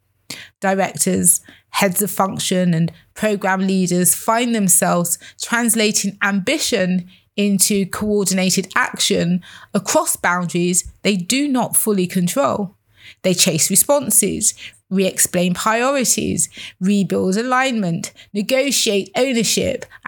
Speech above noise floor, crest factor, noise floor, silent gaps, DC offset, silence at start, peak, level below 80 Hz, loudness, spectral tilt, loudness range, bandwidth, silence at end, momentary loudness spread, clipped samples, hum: 19 dB; 18 dB; -37 dBFS; none; under 0.1%; 0.3 s; 0 dBFS; -54 dBFS; -17 LUFS; -3.5 dB/octave; 2 LU; over 20 kHz; 0 s; 10 LU; under 0.1%; none